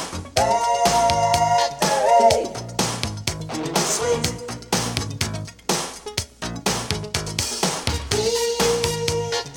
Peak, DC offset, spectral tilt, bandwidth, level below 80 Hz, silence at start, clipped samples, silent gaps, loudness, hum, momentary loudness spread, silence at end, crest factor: 0 dBFS; under 0.1%; -3 dB/octave; 20 kHz; -40 dBFS; 0 s; under 0.1%; none; -21 LUFS; none; 10 LU; 0 s; 20 dB